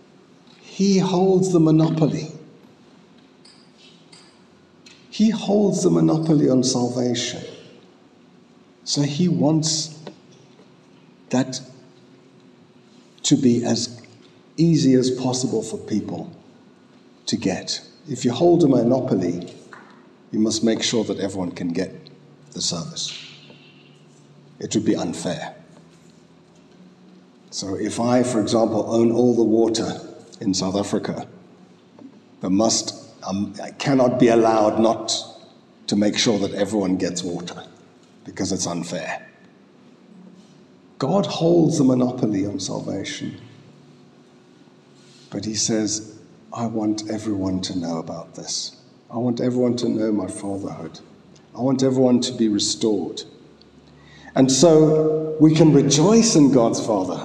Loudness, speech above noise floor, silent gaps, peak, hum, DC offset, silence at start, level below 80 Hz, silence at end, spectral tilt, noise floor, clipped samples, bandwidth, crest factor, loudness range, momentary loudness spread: -20 LUFS; 32 dB; none; -2 dBFS; none; under 0.1%; 0.65 s; -68 dBFS; 0 s; -5 dB/octave; -52 dBFS; under 0.1%; 10.5 kHz; 20 dB; 9 LU; 17 LU